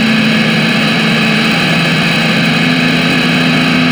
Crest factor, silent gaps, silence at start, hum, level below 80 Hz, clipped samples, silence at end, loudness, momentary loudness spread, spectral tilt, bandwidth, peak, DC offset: 10 dB; none; 0 s; none; -44 dBFS; under 0.1%; 0 s; -10 LUFS; 0 LU; -5 dB/octave; over 20 kHz; 0 dBFS; under 0.1%